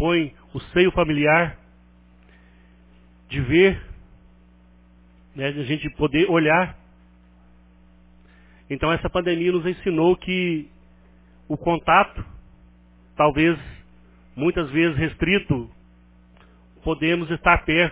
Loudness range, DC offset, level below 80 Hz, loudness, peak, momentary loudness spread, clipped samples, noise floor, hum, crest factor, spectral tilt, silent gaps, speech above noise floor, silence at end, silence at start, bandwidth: 3 LU; under 0.1%; -42 dBFS; -21 LUFS; -2 dBFS; 15 LU; under 0.1%; -52 dBFS; 60 Hz at -50 dBFS; 22 dB; -10 dB/octave; none; 32 dB; 0 s; 0 s; 4 kHz